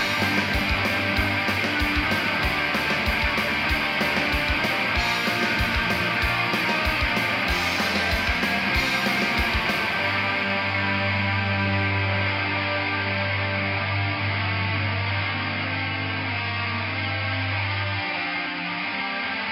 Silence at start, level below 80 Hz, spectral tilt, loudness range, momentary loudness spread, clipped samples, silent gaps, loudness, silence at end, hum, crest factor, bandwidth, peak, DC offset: 0 s; -38 dBFS; -4.5 dB/octave; 3 LU; 4 LU; under 0.1%; none; -23 LUFS; 0 s; none; 14 dB; 16.5 kHz; -10 dBFS; under 0.1%